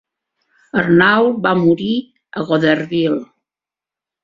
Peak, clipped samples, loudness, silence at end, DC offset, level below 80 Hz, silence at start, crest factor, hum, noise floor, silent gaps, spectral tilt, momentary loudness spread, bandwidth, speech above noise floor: -2 dBFS; under 0.1%; -15 LUFS; 1 s; under 0.1%; -56 dBFS; 0.75 s; 16 dB; none; -89 dBFS; none; -8 dB/octave; 12 LU; 7.2 kHz; 74 dB